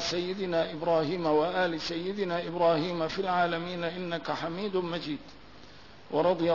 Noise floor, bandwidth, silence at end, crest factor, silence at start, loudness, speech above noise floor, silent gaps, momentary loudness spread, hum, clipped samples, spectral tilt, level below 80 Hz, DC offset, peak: -52 dBFS; 6 kHz; 0 s; 16 dB; 0 s; -30 LUFS; 23 dB; none; 7 LU; none; under 0.1%; -5.5 dB/octave; -62 dBFS; 0.2%; -14 dBFS